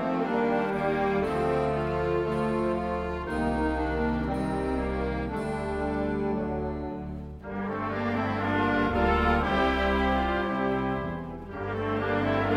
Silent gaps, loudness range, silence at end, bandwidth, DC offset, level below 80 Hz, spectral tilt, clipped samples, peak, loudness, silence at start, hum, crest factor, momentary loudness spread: none; 5 LU; 0 s; 12 kHz; under 0.1%; -38 dBFS; -7.5 dB/octave; under 0.1%; -12 dBFS; -28 LUFS; 0 s; none; 16 dB; 9 LU